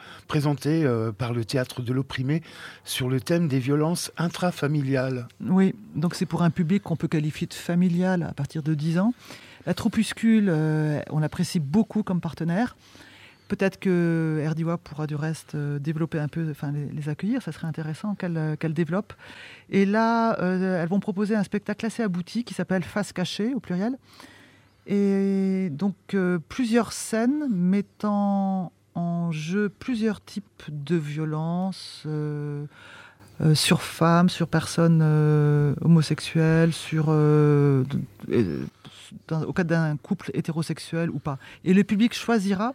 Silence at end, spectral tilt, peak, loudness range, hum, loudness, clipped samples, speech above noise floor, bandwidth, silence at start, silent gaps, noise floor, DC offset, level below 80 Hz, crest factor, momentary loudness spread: 0 s; -6.5 dB/octave; -6 dBFS; 7 LU; none; -25 LUFS; under 0.1%; 30 dB; 15.5 kHz; 0 s; none; -54 dBFS; under 0.1%; -58 dBFS; 18 dB; 11 LU